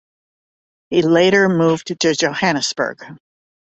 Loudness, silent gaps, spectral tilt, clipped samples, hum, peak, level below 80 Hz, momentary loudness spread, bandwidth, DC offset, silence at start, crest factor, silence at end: -16 LUFS; none; -4.5 dB/octave; under 0.1%; none; -2 dBFS; -58 dBFS; 9 LU; 8.2 kHz; under 0.1%; 0.9 s; 16 dB; 0.5 s